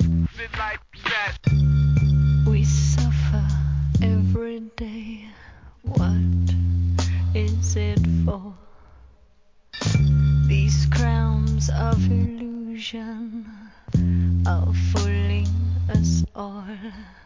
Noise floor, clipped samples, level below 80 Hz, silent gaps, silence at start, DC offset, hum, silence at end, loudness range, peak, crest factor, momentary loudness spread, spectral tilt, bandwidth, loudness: -56 dBFS; under 0.1%; -26 dBFS; none; 0 s; 0.1%; none; 0.15 s; 4 LU; -8 dBFS; 14 dB; 15 LU; -6.5 dB/octave; 7.6 kHz; -22 LUFS